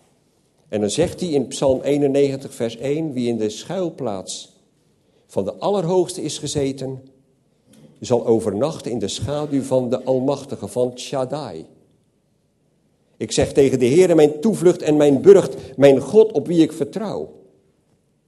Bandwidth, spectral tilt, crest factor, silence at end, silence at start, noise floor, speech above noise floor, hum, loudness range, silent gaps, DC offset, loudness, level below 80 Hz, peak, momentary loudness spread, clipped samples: 12.5 kHz; -6 dB/octave; 20 dB; 0.95 s; 0.7 s; -64 dBFS; 46 dB; none; 10 LU; none; under 0.1%; -19 LUFS; -52 dBFS; 0 dBFS; 14 LU; under 0.1%